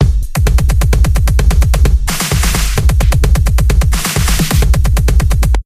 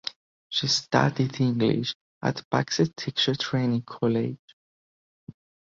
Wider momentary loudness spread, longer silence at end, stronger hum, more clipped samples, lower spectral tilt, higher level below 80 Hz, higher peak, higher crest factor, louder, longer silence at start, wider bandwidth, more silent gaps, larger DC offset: second, 2 LU vs 8 LU; second, 0.05 s vs 0.45 s; neither; neither; about the same, -5 dB/octave vs -5 dB/octave; first, -10 dBFS vs -62 dBFS; first, 0 dBFS vs -4 dBFS; second, 10 dB vs 22 dB; first, -12 LUFS vs -26 LUFS; about the same, 0 s vs 0.05 s; first, 16 kHz vs 7.6 kHz; second, none vs 0.16-0.50 s, 1.95-2.21 s, 2.44-2.51 s, 4.39-5.27 s; first, 0.4% vs under 0.1%